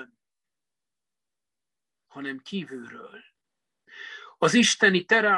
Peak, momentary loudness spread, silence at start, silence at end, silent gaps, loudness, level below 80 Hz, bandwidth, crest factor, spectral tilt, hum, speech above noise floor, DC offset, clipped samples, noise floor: -6 dBFS; 23 LU; 0 s; 0 s; none; -22 LUFS; -74 dBFS; 12 kHz; 20 dB; -3 dB/octave; none; over 66 dB; under 0.1%; under 0.1%; under -90 dBFS